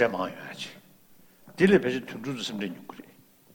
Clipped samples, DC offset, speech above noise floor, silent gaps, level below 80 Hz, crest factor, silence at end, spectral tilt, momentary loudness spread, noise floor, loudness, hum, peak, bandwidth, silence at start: under 0.1%; under 0.1%; 30 dB; none; -62 dBFS; 22 dB; 0.5 s; -6 dB/octave; 24 LU; -57 dBFS; -28 LUFS; none; -6 dBFS; 19.5 kHz; 0 s